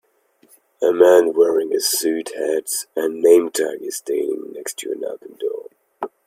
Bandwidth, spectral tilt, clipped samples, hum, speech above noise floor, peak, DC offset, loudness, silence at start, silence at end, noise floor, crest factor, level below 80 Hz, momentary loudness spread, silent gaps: 16.5 kHz; -2 dB/octave; under 0.1%; none; 40 dB; 0 dBFS; under 0.1%; -19 LUFS; 0.8 s; 0.2 s; -58 dBFS; 20 dB; -70 dBFS; 15 LU; none